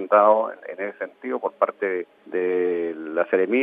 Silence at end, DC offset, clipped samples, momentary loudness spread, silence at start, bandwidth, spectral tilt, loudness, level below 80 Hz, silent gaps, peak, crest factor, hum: 0 s; under 0.1%; under 0.1%; 13 LU; 0 s; 3.8 kHz; -8.5 dB/octave; -24 LUFS; -90 dBFS; none; -4 dBFS; 18 dB; none